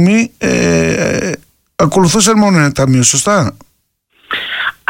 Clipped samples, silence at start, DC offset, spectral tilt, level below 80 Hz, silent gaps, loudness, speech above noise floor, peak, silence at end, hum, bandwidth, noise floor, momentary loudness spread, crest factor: under 0.1%; 0 s; under 0.1%; -4.5 dB/octave; -38 dBFS; none; -11 LUFS; 49 dB; 0 dBFS; 0.2 s; none; 17 kHz; -60 dBFS; 11 LU; 12 dB